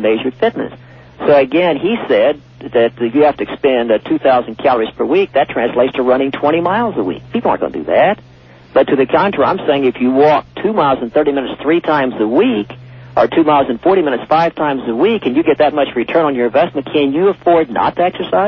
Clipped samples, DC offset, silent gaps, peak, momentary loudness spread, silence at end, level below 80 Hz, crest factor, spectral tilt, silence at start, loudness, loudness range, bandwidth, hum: under 0.1%; under 0.1%; none; 0 dBFS; 5 LU; 0 s; -48 dBFS; 12 dB; -8 dB/octave; 0 s; -14 LUFS; 1 LU; 6 kHz; none